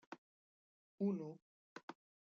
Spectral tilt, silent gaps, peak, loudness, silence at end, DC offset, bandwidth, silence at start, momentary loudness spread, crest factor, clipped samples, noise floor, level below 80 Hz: -8 dB/octave; 0.18-0.98 s, 1.42-1.76 s, 1.83-1.88 s; -30 dBFS; -45 LUFS; 0.4 s; under 0.1%; 7 kHz; 0.1 s; 20 LU; 20 dB; under 0.1%; under -90 dBFS; under -90 dBFS